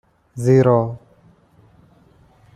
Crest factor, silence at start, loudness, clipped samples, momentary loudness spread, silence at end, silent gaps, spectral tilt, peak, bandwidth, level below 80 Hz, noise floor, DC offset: 18 dB; 0.35 s; -17 LUFS; under 0.1%; 24 LU; 1.6 s; none; -8.5 dB/octave; -2 dBFS; 10.5 kHz; -56 dBFS; -53 dBFS; under 0.1%